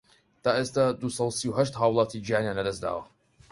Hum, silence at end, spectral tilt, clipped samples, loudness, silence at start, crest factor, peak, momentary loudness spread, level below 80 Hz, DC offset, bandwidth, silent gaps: none; 0.5 s; -5 dB/octave; under 0.1%; -27 LUFS; 0.45 s; 20 dB; -8 dBFS; 7 LU; -58 dBFS; under 0.1%; 11.5 kHz; none